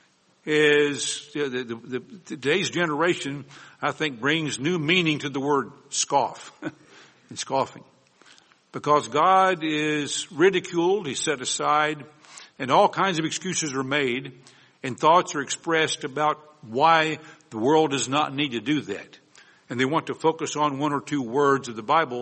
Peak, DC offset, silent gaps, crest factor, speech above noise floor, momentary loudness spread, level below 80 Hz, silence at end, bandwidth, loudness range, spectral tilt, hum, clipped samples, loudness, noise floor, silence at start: -6 dBFS; under 0.1%; none; 20 dB; 32 dB; 15 LU; -70 dBFS; 0 s; 8.8 kHz; 4 LU; -3.5 dB/octave; none; under 0.1%; -23 LUFS; -56 dBFS; 0.45 s